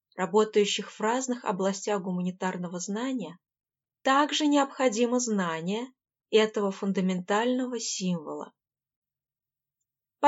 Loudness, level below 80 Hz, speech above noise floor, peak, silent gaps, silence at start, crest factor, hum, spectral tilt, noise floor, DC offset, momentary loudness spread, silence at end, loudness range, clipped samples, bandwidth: -28 LUFS; -88 dBFS; over 63 dB; -8 dBFS; 8.96-9.02 s; 0.15 s; 20 dB; none; -4.5 dB/octave; under -90 dBFS; under 0.1%; 10 LU; 0 s; 5 LU; under 0.1%; 8 kHz